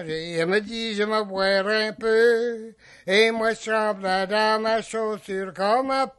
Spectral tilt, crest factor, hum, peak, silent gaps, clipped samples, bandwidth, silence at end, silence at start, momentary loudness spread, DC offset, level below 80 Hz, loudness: -4 dB/octave; 18 dB; none; -6 dBFS; none; under 0.1%; 12 kHz; 0.1 s; 0 s; 10 LU; under 0.1%; -60 dBFS; -23 LUFS